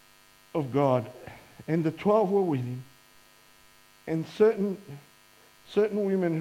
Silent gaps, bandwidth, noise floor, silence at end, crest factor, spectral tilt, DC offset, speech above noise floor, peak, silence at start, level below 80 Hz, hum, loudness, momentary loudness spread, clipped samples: none; 16 kHz; -58 dBFS; 0 s; 18 dB; -8 dB/octave; under 0.1%; 32 dB; -10 dBFS; 0.55 s; -68 dBFS; none; -27 LUFS; 21 LU; under 0.1%